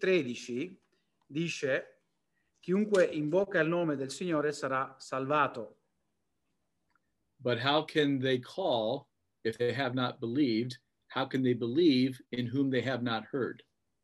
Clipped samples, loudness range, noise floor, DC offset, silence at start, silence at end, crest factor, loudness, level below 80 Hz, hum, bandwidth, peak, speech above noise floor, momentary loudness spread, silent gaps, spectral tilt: under 0.1%; 4 LU; -83 dBFS; under 0.1%; 0 s; 0.5 s; 18 dB; -31 LUFS; -78 dBFS; none; 12 kHz; -14 dBFS; 52 dB; 11 LU; none; -6 dB/octave